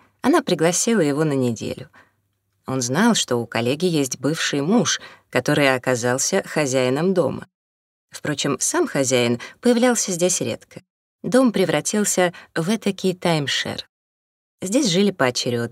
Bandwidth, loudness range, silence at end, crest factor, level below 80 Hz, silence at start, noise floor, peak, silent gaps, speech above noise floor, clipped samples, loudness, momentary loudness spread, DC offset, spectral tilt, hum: 16 kHz; 2 LU; 0 s; 20 dB; -64 dBFS; 0.25 s; -70 dBFS; -2 dBFS; 7.54-8.08 s, 10.90-11.19 s, 13.89-14.58 s; 50 dB; under 0.1%; -20 LUFS; 10 LU; under 0.1%; -4 dB/octave; none